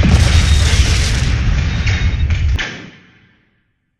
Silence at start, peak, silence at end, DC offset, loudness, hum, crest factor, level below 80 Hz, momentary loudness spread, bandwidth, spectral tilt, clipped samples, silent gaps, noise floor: 0 s; 0 dBFS; 1.1 s; under 0.1%; -15 LUFS; none; 14 dB; -16 dBFS; 7 LU; 12.5 kHz; -4.5 dB/octave; under 0.1%; none; -63 dBFS